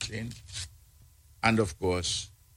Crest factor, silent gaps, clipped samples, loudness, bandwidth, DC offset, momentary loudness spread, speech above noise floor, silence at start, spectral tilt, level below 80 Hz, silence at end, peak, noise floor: 24 dB; none; under 0.1%; -30 LUFS; 16.5 kHz; under 0.1%; 14 LU; 28 dB; 0 s; -4 dB/octave; -52 dBFS; 0.3 s; -8 dBFS; -58 dBFS